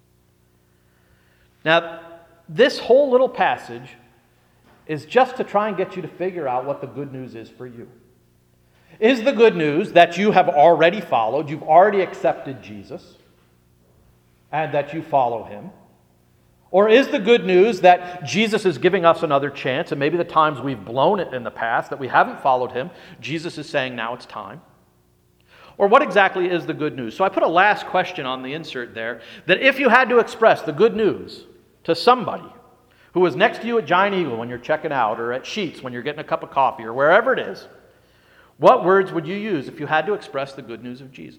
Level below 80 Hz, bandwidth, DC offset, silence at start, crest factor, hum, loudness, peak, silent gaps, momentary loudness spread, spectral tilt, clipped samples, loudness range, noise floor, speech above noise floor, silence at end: -64 dBFS; 14 kHz; under 0.1%; 1.65 s; 20 dB; 60 Hz at -55 dBFS; -19 LUFS; 0 dBFS; none; 18 LU; -5.5 dB/octave; under 0.1%; 8 LU; -59 dBFS; 40 dB; 0.1 s